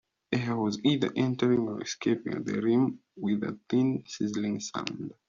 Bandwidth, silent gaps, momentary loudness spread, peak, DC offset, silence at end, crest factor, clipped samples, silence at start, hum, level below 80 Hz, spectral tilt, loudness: 7.4 kHz; none; 7 LU; -10 dBFS; under 0.1%; 0.15 s; 20 dB; under 0.1%; 0.3 s; none; -68 dBFS; -5.5 dB/octave; -29 LUFS